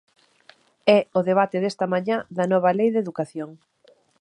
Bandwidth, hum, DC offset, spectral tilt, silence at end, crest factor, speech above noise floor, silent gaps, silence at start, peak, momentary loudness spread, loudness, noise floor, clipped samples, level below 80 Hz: 10.5 kHz; none; under 0.1%; -6.5 dB/octave; 0.65 s; 20 dB; 34 dB; none; 0.85 s; -2 dBFS; 11 LU; -22 LUFS; -56 dBFS; under 0.1%; -74 dBFS